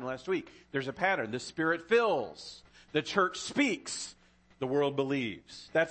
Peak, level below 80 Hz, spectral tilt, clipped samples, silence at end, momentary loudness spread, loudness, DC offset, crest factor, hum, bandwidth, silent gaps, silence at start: -14 dBFS; -68 dBFS; -4 dB/octave; under 0.1%; 0 s; 14 LU; -32 LUFS; under 0.1%; 18 dB; none; 8.8 kHz; none; 0 s